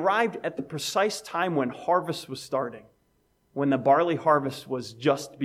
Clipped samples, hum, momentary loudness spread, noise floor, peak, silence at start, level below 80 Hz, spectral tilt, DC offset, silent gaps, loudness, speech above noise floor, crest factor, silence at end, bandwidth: under 0.1%; none; 12 LU; -68 dBFS; -8 dBFS; 0 s; -70 dBFS; -5 dB/octave; under 0.1%; none; -26 LUFS; 42 dB; 20 dB; 0 s; 15.5 kHz